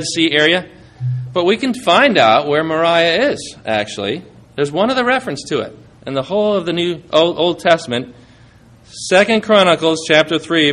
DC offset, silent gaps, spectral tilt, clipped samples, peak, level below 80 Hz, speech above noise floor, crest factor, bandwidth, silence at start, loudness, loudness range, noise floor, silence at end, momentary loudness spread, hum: under 0.1%; none; -4.5 dB/octave; under 0.1%; 0 dBFS; -54 dBFS; 30 dB; 16 dB; 12 kHz; 0 s; -15 LUFS; 5 LU; -45 dBFS; 0 s; 12 LU; none